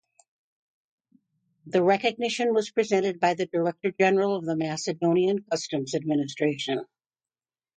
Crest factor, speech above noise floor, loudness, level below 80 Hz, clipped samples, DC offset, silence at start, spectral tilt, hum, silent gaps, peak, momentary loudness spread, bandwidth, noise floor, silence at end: 18 dB; over 65 dB; -26 LUFS; -74 dBFS; under 0.1%; under 0.1%; 1.65 s; -5 dB/octave; none; none; -8 dBFS; 7 LU; 9.2 kHz; under -90 dBFS; 0.9 s